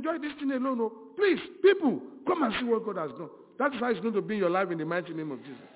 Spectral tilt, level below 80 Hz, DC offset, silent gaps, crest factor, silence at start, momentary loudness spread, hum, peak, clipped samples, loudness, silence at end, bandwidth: -4 dB/octave; -70 dBFS; under 0.1%; none; 18 dB; 0 s; 13 LU; none; -10 dBFS; under 0.1%; -29 LUFS; 0.1 s; 4 kHz